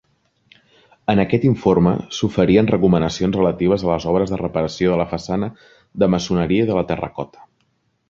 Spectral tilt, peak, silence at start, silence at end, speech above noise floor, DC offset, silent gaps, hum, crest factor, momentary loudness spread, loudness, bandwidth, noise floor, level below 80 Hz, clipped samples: -7 dB/octave; -2 dBFS; 1.1 s; 0.85 s; 48 dB; under 0.1%; none; none; 16 dB; 9 LU; -18 LUFS; 7.4 kHz; -66 dBFS; -42 dBFS; under 0.1%